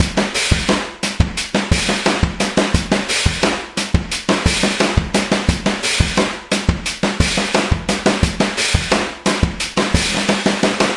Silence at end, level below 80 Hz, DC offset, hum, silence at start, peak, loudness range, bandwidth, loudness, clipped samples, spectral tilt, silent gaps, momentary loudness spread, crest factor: 0 s; -28 dBFS; under 0.1%; none; 0 s; 0 dBFS; 0 LU; 11.5 kHz; -17 LUFS; under 0.1%; -4 dB/octave; none; 4 LU; 18 dB